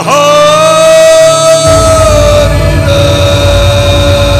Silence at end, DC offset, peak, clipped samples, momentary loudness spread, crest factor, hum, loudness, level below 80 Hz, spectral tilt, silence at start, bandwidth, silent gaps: 0 s; 0.9%; 0 dBFS; 7%; 4 LU; 4 dB; none; -5 LUFS; -16 dBFS; -4.5 dB/octave; 0 s; 15.5 kHz; none